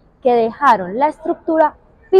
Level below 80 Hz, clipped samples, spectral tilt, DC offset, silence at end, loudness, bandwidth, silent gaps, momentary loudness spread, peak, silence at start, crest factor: -52 dBFS; under 0.1%; -6.5 dB/octave; under 0.1%; 0 s; -16 LUFS; 11 kHz; none; 5 LU; -2 dBFS; 0.25 s; 14 dB